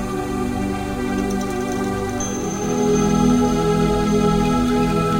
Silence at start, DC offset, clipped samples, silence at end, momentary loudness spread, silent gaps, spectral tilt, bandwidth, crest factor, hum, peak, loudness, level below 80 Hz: 0 s; under 0.1%; under 0.1%; 0 s; 7 LU; none; -6 dB/octave; 17 kHz; 14 dB; none; -4 dBFS; -20 LUFS; -32 dBFS